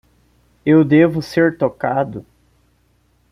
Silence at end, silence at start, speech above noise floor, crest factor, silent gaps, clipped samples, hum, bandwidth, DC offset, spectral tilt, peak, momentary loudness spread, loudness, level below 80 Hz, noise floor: 1.1 s; 0.65 s; 44 dB; 16 dB; none; under 0.1%; none; 11 kHz; under 0.1%; -8 dB/octave; -2 dBFS; 13 LU; -16 LUFS; -54 dBFS; -59 dBFS